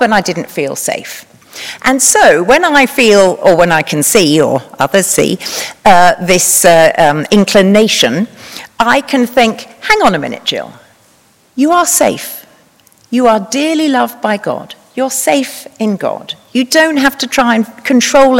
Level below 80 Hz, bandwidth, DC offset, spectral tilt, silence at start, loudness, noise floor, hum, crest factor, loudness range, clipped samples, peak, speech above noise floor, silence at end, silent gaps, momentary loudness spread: -44 dBFS; over 20 kHz; under 0.1%; -3 dB/octave; 0 s; -10 LUFS; -49 dBFS; none; 10 dB; 6 LU; 1%; 0 dBFS; 39 dB; 0 s; none; 14 LU